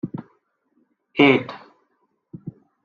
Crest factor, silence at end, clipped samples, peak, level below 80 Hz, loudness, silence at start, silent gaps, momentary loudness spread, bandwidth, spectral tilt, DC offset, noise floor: 22 dB; 0.35 s; under 0.1%; -2 dBFS; -66 dBFS; -19 LUFS; 0.05 s; none; 24 LU; 6.8 kHz; -7.5 dB/octave; under 0.1%; -69 dBFS